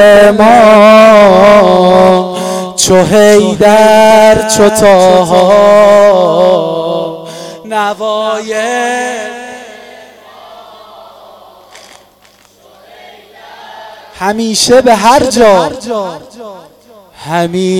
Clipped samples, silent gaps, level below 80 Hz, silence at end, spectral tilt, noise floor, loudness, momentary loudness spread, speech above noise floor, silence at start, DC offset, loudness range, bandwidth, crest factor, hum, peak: 3%; none; -40 dBFS; 0 s; -4 dB/octave; -44 dBFS; -6 LUFS; 14 LU; 38 dB; 0 s; under 0.1%; 13 LU; 16 kHz; 8 dB; 50 Hz at -50 dBFS; 0 dBFS